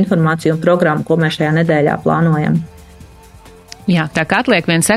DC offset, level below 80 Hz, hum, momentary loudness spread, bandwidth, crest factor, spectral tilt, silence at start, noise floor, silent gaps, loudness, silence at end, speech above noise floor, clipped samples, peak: under 0.1%; -46 dBFS; none; 4 LU; 14 kHz; 14 dB; -5.5 dB/octave; 0 s; -40 dBFS; none; -14 LUFS; 0 s; 27 dB; under 0.1%; 0 dBFS